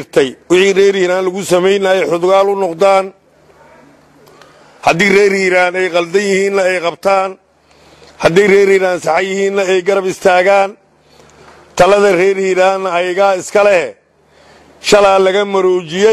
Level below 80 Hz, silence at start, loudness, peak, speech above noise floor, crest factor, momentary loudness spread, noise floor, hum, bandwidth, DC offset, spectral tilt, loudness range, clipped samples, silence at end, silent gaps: -48 dBFS; 0 s; -11 LUFS; 0 dBFS; 37 dB; 12 dB; 6 LU; -48 dBFS; none; 13.5 kHz; under 0.1%; -4.5 dB/octave; 2 LU; under 0.1%; 0 s; none